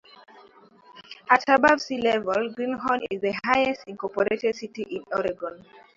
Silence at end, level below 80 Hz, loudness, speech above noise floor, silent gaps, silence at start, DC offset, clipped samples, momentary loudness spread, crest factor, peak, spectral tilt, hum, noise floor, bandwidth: 0.4 s; -62 dBFS; -24 LUFS; 29 dB; none; 0.95 s; under 0.1%; under 0.1%; 15 LU; 22 dB; -2 dBFS; -4.5 dB/octave; none; -53 dBFS; 7.8 kHz